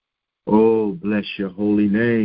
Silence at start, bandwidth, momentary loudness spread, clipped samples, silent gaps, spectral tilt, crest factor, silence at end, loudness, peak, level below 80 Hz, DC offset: 0.45 s; 5.2 kHz; 9 LU; under 0.1%; none; -12 dB/octave; 16 dB; 0 s; -19 LUFS; -2 dBFS; -52 dBFS; under 0.1%